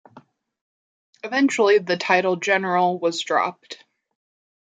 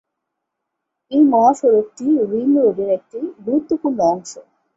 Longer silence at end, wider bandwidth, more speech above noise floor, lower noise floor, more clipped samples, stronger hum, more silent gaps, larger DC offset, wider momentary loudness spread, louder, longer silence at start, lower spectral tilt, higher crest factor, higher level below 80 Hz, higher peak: first, 0.85 s vs 0.35 s; first, 9.2 kHz vs 8 kHz; second, 31 dB vs 62 dB; second, -52 dBFS vs -78 dBFS; neither; neither; first, 0.61-1.13 s vs none; neither; first, 20 LU vs 12 LU; second, -20 LUFS vs -17 LUFS; second, 0.15 s vs 1.1 s; second, -4 dB/octave vs -7 dB/octave; about the same, 20 dB vs 16 dB; second, -78 dBFS vs -62 dBFS; about the same, -4 dBFS vs -2 dBFS